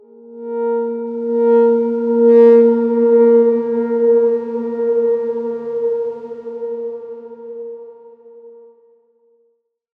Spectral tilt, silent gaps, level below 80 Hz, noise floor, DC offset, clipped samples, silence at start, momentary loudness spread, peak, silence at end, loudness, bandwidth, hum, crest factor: -9.5 dB/octave; none; -74 dBFS; -64 dBFS; under 0.1%; under 0.1%; 0.3 s; 20 LU; -2 dBFS; 1.5 s; -15 LUFS; 3.2 kHz; none; 14 dB